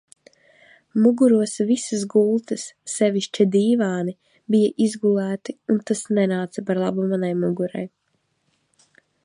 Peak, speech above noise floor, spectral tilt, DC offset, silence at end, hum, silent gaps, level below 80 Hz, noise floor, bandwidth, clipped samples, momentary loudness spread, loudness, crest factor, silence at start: -4 dBFS; 50 dB; -6 dB/octave; under 0.1%; 1.4 s; none; none; -72 dBFS; -70 dBFS; 11 kHz; under 0.1%; 12 LU; -21 LUFS; 16 dB; 0.95 s